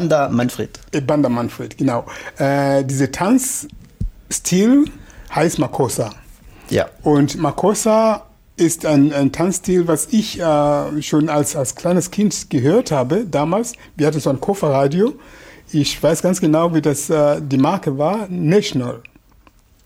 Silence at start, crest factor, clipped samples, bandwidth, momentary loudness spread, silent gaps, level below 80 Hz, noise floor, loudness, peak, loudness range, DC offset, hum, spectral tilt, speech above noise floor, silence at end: 0 s; 14 dB; under 0.1%; 16.5 kHz; 9 LU; none; -42 dBFS; -51 dBFS; -17 LUFS; -4 dBFS; 2 LU; under 0.1%; none; -5.5 dB/octave; 34 dB; 0.85 s